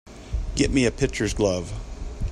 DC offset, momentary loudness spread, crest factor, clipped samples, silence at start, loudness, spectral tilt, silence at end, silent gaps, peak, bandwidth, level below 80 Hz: under 0.1%; 14 LU; 18 dB; under 0.1%; 0.05 s; -24 LUFS; -5 dB/octave; 0 s; none; -6 dBFS; 13 kHz; -32 dBFS